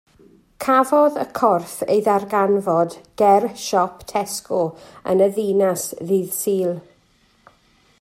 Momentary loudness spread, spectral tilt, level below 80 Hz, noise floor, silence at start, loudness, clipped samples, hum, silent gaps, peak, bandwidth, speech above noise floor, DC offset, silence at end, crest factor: 9 LU; -5 dB/octave; -62 dBFS; -59 dBFS; 0.6 s; -19 LUFS; under 0.1%; none; none; -2 dBFS; 16 kHz; 40 dB; under 0.1%; 1.2 s; 18 dB